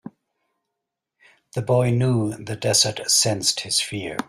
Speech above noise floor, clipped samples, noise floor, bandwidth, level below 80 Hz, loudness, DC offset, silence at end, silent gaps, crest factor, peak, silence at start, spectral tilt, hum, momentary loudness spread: 61 dB; under 0.1%; -83 dBFS; 15.5 kHz; -56 dBFS; -20 LUFS; under 0.1%; 0.05 s; none; 20 dB; -4 dBFS; 0.05 s; -3.5 dB/octave; none; 10 LU